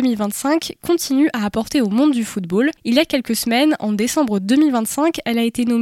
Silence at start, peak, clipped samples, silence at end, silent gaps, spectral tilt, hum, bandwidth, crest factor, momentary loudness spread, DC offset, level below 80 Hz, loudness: 0 s; -2 dBFS; under 0.1%; 0 s; none; -4 dB/octave; none; 17 kHz; 14 dB; 5 LU; under 0.1%; -52 dBFS; -18 LUFS